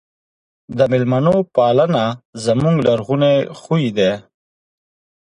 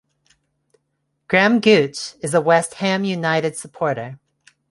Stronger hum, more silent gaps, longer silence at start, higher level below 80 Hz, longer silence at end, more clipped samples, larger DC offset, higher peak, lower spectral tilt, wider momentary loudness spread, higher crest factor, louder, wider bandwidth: neither; first, 2.25-2.33 s vs none; second, 0.7 s vs 1.3 s; first, -52 dBFS vs -64 dBFS; first, 1.05 s vs 0.55 s; neither; neither; about the same, -2 dBFS vs -2 dBFS; first, -7 dB/octave vs -4.5 dB/octave; second, 6 LU vs 12 LU; about the same, 16 dB vs 18 dB; about the same, -16 LUFS vs -18 LUFS; about the same, 11 kHz vs 11.5 kHz